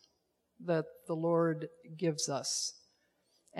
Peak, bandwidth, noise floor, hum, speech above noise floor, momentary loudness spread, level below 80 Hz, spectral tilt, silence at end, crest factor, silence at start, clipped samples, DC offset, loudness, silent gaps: -18 dBFS; 13 kHz; -78 dBFS; none; 44 dB; 10 LU; -84 dBFS; -4 dB/octave; 0 s; 18 dB; 0.6 s; under 0.1%; under 0.1%; -34 LUFS; none